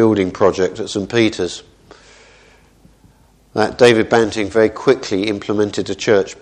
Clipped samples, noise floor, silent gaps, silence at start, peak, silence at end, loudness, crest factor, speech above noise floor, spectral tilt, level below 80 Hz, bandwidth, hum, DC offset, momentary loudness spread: under 0.1%; -50 dBFS; none; 0 s; 0 dBFS; 0.1 s; -16 LUFS; 16 dB; 35 dB; -5 dB/octave; -50 dBFS; 10.5 kHz; none; under 0.1%; 10 LU